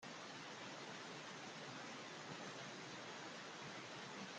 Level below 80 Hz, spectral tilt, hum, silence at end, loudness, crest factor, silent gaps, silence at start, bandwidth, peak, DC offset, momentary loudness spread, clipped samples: under -90 dBFS; -3 dB/octave; none; 0 s; -51 LUFS; 14 dB; none; 0 s; 11.5 kHz; -38 dBFS; under 0.1%; 1 LU; under 0.1%